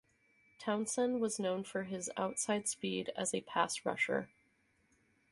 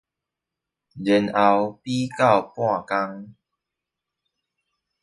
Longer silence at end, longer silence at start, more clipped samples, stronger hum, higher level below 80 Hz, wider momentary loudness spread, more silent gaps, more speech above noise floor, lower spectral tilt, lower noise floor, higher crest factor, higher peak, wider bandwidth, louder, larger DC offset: second, 1.05 s vs 1.7 s; second, 0.6 s vs 0.95 s; neither; neither; second, -78 dBFS vs -64 dBFS; second, 5 LU vs 10 LU; neither; second, 38 dB vs 64 dB; second, -3 dB/octave vs -6 dB/octave; second, -74 dBFS vs -86 dBFS; about the same, 22 dB vs 22 dB; second, -16 dBFS vs -4 dBFS; about the same, 12 kHz vs 11.5 kHz; second, -37 LUFS vs -22 LUFS; neither